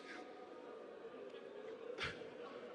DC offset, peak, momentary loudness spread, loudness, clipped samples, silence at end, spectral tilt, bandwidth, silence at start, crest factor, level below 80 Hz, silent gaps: under 0.1%; -32 dBFS; 9 LU; -51 LUFS; under 0.1%; 0 s; -4 dB/octave; 11 kHz; 0 s; 20 dB; -76 dBFS; none